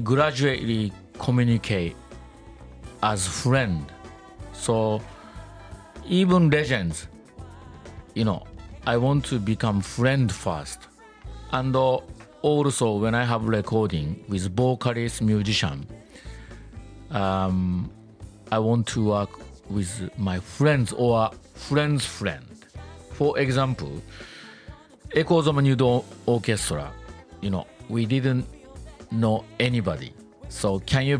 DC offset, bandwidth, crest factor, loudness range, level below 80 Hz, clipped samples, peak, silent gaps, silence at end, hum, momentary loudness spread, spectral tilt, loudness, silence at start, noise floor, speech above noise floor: under 0.1%; 10.5 kHz; 18 dB; 3 LU; -46 dBFS; under 0.1%; -8 dBFS; none; 0 s; none; 22 LU; -6 dB/octave; -24 LUFS; 0 s; -46 dBFS; 23 dB